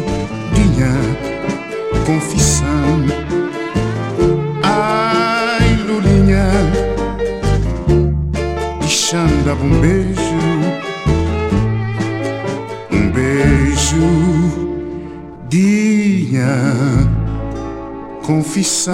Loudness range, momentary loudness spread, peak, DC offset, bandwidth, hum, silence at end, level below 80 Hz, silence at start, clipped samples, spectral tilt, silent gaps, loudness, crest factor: 2 LU; 9 LU; 0 dBFS; under 0.1%; 16 kHz; none; 0 s; -24 dBFS; 0 s; under 0.1%; -5.5 dB/octave; none; -15 LUFS; 14 dB